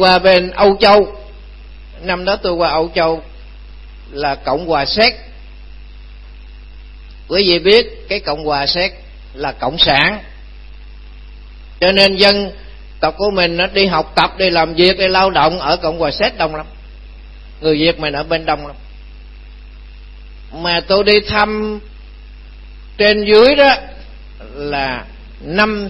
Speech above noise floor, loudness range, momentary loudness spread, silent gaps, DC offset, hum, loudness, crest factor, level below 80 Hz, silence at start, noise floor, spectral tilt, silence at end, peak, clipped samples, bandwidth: 21 dB; 6 LU; 15 LU; none; under 0.1%; 50 Hz at -35 dBFS; -13 LUFS; 16 dB; -34 dBFS; 0 s; -34 dBFS; -5.5 dB/octave; 0 s; 0 dBFS; under 0.1%; 11 kHz